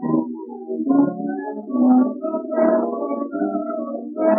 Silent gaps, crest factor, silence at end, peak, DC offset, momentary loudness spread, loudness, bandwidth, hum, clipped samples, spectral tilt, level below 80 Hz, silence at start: none; 14 dB; 0 s; -6 dBFS; under 0.1%; 12 LU; -21 LUFS; 2.7 kHz; none; under 0.1%; -14.5 dB/octave; under -90 dBFS; 0 s